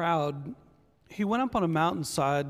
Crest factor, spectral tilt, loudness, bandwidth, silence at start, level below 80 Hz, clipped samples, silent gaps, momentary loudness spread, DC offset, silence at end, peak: 16 dB; -5.5 dB/octave; -28 LUFS; 15.5 kHz; 0 s; -58 dBFS; under 0.1%; none; 17 LU; under 0.1%; 0 s; -12 dBFS